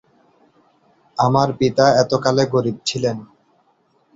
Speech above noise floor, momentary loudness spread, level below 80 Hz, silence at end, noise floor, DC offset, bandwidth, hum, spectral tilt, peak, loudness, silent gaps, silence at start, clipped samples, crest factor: 44 dB; 9 LU; -54 dBFS; 0.9 s; -61 dBFS; under 0.1%; 8 kHz; none; -5.5 dB/octave; -2 dBFS; -17 LUFS; none; 1.15 s; under 0.1%; 18 dB